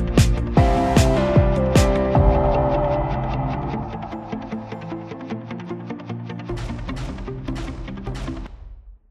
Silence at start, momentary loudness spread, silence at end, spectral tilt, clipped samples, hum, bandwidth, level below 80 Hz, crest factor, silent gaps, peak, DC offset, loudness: 0 s; 15 LU; 0.15 s; -6.5 dB/octave; under 0.1%; none; 14.5 kHz; -26 dBFS; 18 dB; none; -2 dBFS; under 0.1%; -22 LUFS